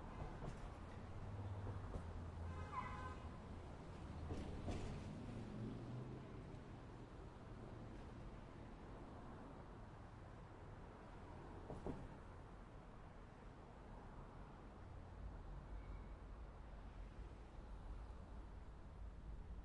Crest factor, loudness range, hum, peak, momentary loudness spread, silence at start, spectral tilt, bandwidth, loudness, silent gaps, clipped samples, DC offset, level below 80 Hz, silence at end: 18 dB; 6 LU; none; -34 dBFS; 9 LU; 0 s; -7.5 dB/octave; 11 kHz; -55 LUFS; none; under 0.1%; under 0.1%; -58 dBFS; 0 s